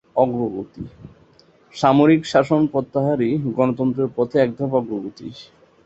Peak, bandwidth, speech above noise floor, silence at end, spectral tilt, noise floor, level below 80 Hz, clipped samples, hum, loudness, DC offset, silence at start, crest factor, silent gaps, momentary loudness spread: -2 dBFS; 8 kHz; 34 dB; 0.4 s; -7.5 dB/octave; -53 dBFS; -56 dBFS; under 0.1%; none; -19 LUFS; under 0.1%; 0.15 s; 18 dB; none; 20 LU